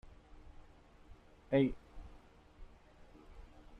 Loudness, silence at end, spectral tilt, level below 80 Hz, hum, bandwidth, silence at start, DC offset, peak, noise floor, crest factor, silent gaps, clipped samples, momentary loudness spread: -34 LUFS; 0 s; -8.5 dB/octave; -56 dBFS; none; 6.2 kHz; 0.05 s; under 0.1%; -18 dBFS; -60 dBFS; 24 dB; none; under 0.1%; 29 LU